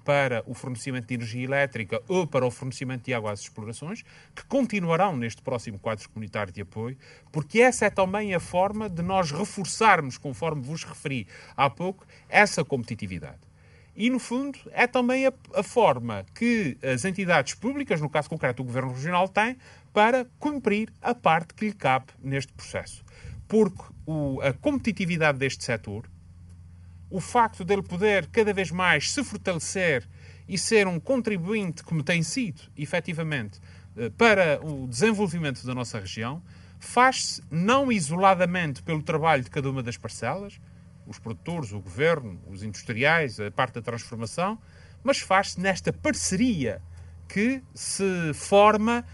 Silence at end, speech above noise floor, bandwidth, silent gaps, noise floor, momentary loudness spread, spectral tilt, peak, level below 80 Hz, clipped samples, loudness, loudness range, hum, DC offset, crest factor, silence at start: 0 s; 27 dB; 11.5 kHz; none; -52 dBFS; 14 LU; -5 dB/octave; -2 dBFS; -56 dBFS; under 0.1%; -26 LUFS; 5 LU; none; under 0.1%; 24 dB; 0.05 s